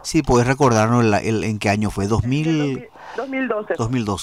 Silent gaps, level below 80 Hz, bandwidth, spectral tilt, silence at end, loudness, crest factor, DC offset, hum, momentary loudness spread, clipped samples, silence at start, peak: none; -40 dBFS; 14.5 kHz; -6 dB/octave; 0 s; -19 LUFS; 14 dB; 0.2%; none; 9 LU; under 0.1%; 0.05 s; -6 dBFS